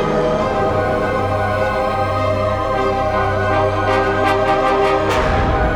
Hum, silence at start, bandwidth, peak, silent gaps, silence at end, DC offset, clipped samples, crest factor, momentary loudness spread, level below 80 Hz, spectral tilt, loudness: none; 0 s; 13.5 kHz; -2 dBFS; none; 0 s; under 0.1%; under 0.1%; 14 dB; 3 LU; -28 dBFS; -6.5 dB/octave; -17 LUFS